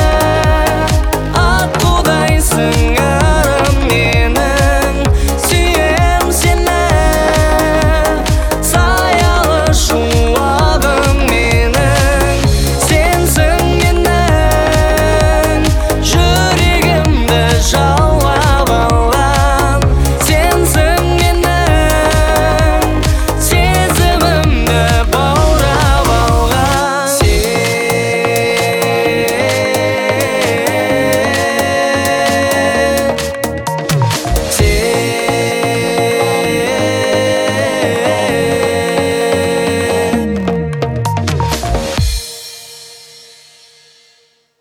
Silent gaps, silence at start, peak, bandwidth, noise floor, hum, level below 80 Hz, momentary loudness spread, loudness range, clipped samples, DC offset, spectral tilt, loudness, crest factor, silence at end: none; 0 s; 0 dBFS; over 20 kHz; -53 dBFS; none; -18 dBFS; 3 LU; 3 LU; under 0.1%; under 0.1%; -4.5 dB/octave; -12 LUFS; 12 dB; 1.65 s